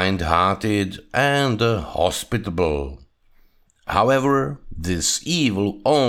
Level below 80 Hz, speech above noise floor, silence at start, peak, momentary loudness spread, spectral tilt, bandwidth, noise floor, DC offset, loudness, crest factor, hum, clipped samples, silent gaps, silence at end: -40 dBFS; 35 dB; 0 s; -4 dBFS; 9 LU; -4.5 dB/octave; 18.5 kHz; -56 dBFS; under 0.1%; -21 LUFS; 18 dB; none; under 0.1%; none; 0 s